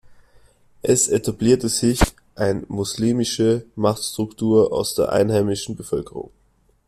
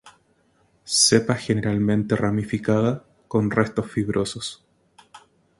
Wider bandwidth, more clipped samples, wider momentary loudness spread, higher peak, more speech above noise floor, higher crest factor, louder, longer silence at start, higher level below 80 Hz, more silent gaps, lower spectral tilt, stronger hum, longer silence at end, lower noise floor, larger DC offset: first, 15 kHz vs 11.5 kHz; neither; about the same, 10 LU vs 10 LU; about the same, -2 dBFS vs -4 dBFS; about the same, 41 dB vs 41 dB; about the same, 18 dB vs 20 dB; about the same, -20 LUFS vs -22 LUFS; about the same, 0.1 s vs 0.05 s; first, -38 dBFS vs -52 dBFS; neither; about the same, -4.5 dB/octave vs -4.5 dB/octave; neither; first, 0.65 s vs 0.4 s; about the same, -60 dBFS vs -63 dBFS; neither